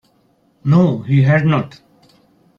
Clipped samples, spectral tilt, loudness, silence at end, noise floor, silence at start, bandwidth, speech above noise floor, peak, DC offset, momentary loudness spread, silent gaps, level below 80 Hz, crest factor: under 0.1%; -9 dB/octave; -15 LUFS; 0.9 s; -58 dBFS; 0.65 s; 6.6 kHz; 44 dB; -2 dBFS; under 0.1%; 11 LU; none; -52 dBFS; 14 dB